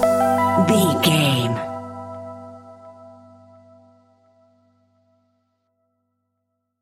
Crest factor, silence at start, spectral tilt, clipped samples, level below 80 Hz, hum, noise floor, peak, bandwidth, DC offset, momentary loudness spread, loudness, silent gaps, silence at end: 18 dB; 0 s; -5 dB/octave; under 0.1%; -60 dBFS; none; -76 dBFS; -4 dBFS; 17 kHz; under 0.1%; 22 LU; -18 LUFS; none; 3.7 s